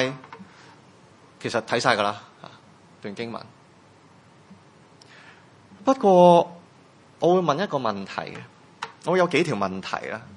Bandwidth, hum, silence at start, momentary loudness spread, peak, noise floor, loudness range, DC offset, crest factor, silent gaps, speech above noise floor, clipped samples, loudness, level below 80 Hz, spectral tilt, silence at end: 11 kHz; none; 0 s; 23 LU; -2 dBFS; -53 dBFS; 18 LU; under 0.1%; 22 dB; none; 31 dB; under 0.1%; -22 LUFS; -72 dBFS; -5.5 dB/octave; 0 s